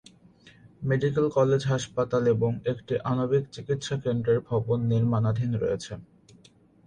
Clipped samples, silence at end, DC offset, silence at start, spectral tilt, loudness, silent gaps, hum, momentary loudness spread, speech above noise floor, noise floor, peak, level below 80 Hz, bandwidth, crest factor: under 0.1%; 0.85 s; under 0.1%; 0.65 s; -7 dB/octave; -26 LUFS; none; none; 8 LU; 32 dB; -57 dBFS; -10 dBFS; -56 dBFS; 9.8 kHz; 16 dB